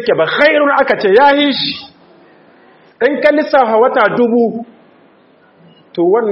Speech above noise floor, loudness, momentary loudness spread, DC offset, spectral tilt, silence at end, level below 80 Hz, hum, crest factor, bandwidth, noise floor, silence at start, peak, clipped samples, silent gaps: 37 dB; -11 LUFS; 9 LU; under 0.1%; -6.5 dB/octave; 0 s; -58 dBFS; none; 12 dB; 6 kHz; -48 dBFS; 0 s; 0 dBFS; under 0.1%; none